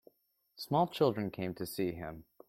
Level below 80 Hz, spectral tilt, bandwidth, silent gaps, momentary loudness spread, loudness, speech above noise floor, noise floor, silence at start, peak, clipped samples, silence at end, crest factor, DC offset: -66 dBFS; -6.5 dB/octave; 16.5 kHz; none; 15 LU; -34 LUFS; 38 dB; -72 dBFS; 0.6 s; -16 dBFS; under 0.1%; 0.25 s; 20 dB; under 0.1%